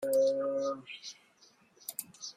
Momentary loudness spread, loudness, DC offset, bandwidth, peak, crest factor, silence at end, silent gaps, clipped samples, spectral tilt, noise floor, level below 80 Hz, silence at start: 18 LU; -34 LUFS; under 0.1%; 15.5 kHz; -18 dBFS; 16 dB; 0.05 s; none; under 0.1%; -3 dB/octave; -65 dBFS; -82 dBFS; 0 s